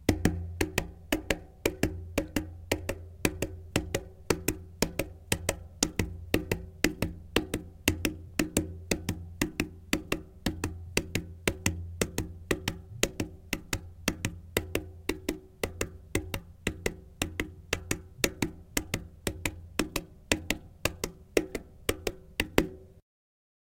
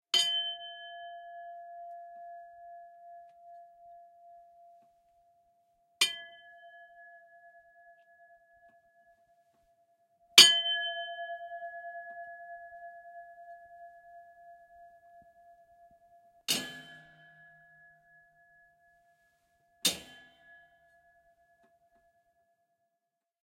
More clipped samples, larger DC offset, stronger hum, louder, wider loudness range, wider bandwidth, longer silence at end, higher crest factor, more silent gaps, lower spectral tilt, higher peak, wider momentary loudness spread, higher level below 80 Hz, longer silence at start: neither; neither; neither; second, -33 LUFS vs -26 LUFS; second, 3 LU vs 25 LU; about the same, 17 kHz vs 16 kHz; second, 0.75 s vs 3.45 s; about the same, 32 dB vs 34 dB; neither; first, -4 dB/octave vs 1 dB/octave; about the same, 0 dBFS vs -2 dBFS; second, 7 LU vs 28 LU; first, -44 dBFS vs -82 dBFS; second, 0 s vs 0.15 s